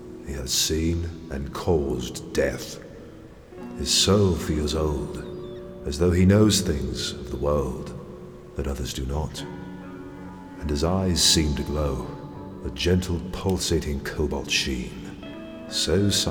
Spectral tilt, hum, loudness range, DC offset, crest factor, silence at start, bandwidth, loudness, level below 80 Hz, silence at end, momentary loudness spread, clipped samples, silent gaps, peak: -4.5 dB/octave; none; 7 LU; under 0.1%; 20 dB; 0 s; over 20 kHz; -24 LUFS; -36 dBFS; 0 s; 20 LU; under 0.1%; none; -6 dBFS